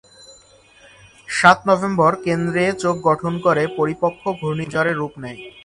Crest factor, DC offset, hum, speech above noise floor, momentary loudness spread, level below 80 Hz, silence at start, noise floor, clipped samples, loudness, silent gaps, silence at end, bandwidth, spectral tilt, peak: 20 dB; under 0.1%; none; 31 dB; 11 LU; -54 dBFS; 0.3 s; -50 dBFS; under 0.1%; -18 LUFS; none; 0.05 s; 11.5 kHz; -5.5 dB/octave; 0 dBFS